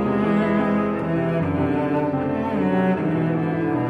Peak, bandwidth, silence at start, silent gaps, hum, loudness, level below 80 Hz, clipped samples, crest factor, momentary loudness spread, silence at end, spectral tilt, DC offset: -8 dBFS; 5.2 kHz; 0 s; none; none; -22 LUFS; -50 dBFS; under 0.1%; 14 dB; 3 LU; 0 s; -9.5 dB/octave; under 0.1%